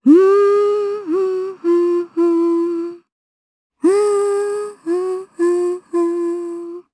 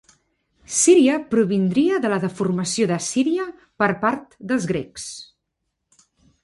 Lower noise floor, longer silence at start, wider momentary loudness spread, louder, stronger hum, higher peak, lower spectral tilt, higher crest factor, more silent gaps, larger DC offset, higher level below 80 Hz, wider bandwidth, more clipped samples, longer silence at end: first, under -90 dBFS vs -77 dBFS; second, 0.05 s vs 0.7 s; second, 11 LU vs 16 LU; first, -17 LUFS vs -20 LUFS; neither; about the same, -2 dBFS vs -4 dBFS; about the same, -5 dB/octave vs -4.5 dB/octave; about the same, 14 dB vs 18 dB; first, 3.12-3.70 s vs none; neither; second, -74 dBFS vs -60 dBFS; about the same, 11 kHz vs 11.5 kHz; neither; second, 0.15 s vs 1.2 s